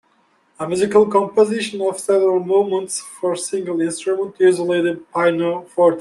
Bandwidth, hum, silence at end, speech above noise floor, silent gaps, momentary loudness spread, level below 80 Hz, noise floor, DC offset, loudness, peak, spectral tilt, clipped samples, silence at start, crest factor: 12.5 kHz; none; 0 s; 42 dB; none; 8 LU; -64 dBFS; -60 dBFS; under 0.1%; -18 LUFS; -2 dBFS; -4.5 dB/octave; under 0.1%; 0.6 s; 16 dB